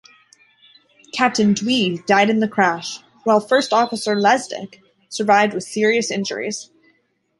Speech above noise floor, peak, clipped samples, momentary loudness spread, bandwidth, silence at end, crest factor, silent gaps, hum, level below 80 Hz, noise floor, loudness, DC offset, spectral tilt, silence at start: 46 dB; -2 dBFS; under 0.1%; 14 LU; 11.5 kHz; 0.75 s; 18 dB; none; none; -66 dBFS; -64 dBFS; -18 LUFS; under 0.1%; -4 dB/octave; 1.15 s